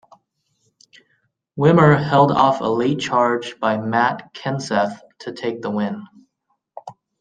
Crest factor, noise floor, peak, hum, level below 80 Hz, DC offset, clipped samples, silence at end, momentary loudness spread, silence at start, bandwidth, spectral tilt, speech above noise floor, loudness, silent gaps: 18 dB; -71 dBFS; -2 dBFS; none; -58 dBFS; under 0.1%; under 0.1%; 0.3 s; 20 LU; 1.55 s; 9.2 kHz; -6.5 dB/octave; 54 dB; -18 LUFS; none